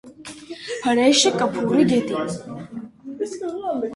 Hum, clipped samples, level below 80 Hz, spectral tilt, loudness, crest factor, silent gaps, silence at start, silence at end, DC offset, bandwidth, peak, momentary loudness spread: none; under 0.1%; -60 dBFS; -3.5 dB/octave; -20 LUFS; 18 dB; none; 0.05 s; 0 s; under 0.1%; 11.5 kHz; -4 dBFS; 20 LU